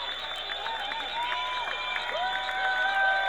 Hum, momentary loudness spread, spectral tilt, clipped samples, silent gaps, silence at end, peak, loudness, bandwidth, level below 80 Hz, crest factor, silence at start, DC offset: none; 7 LU; -1 dB/octave; under 0.1%; none; 0 s; -14 dBFS; -29 LUFS; over 20 kHz; -60 dBFS; 14 dB; 0 s; 0.2%